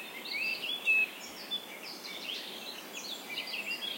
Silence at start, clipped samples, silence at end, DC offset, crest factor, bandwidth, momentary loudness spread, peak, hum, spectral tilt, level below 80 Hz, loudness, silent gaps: 0 s; under 0.1%; 0 s; under 0.1%; 18 dB; 16.5 kHz; 14 LU; -20 dBFS; none; -0.5 dB/octave; -84 dBFS; -34 LUFS; none